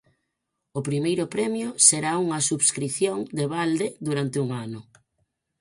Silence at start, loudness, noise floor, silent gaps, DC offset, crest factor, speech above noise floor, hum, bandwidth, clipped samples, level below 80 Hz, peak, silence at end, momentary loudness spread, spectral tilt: 0.75 s; -23 LUFS; -80 dBFS; none; under 0.1%; 24 dB; 56 dB; none; 11.5 kHz; under 0.1%; -66 dBFS; -2 dBFS; 0.8 s; 15 LU; -3.5 dB/octave